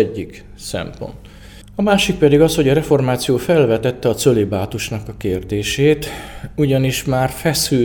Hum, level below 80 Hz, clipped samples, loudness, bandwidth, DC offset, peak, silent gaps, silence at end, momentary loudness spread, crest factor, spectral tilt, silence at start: none; -38 dBFS; under 0.1%; -17 LUFS; over 20 kHz; under 0.1%; 0 dBFS; none; 0 s; 16 LU; 16 dB; -5.5 dB/octave; 0 s